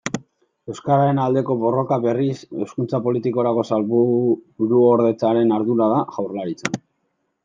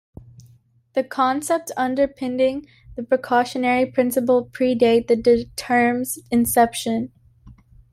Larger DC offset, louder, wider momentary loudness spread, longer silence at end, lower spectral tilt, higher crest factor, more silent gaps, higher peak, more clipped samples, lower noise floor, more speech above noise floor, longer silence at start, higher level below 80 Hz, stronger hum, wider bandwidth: neither; about the same, -20 LUFS vs -20 LUFS; about the same, 11 LU vs 9 LU; first, 0.65 s vs 0.4 s; first, -7.5 dB/octave vs -4 dB/octave; about the same, 18 dB vs 18 dB; neither; about the same, -2 dBFS vs -4 dBFS; neither; first, -71 dBFS vs -55 dBFS; first, 53 dB vs 35 dB; second, 0.05 s vs 0.95 s; second, -66 dBFS vs -52 dBFS; neither; second, 7.6 kHz vs 16 kHz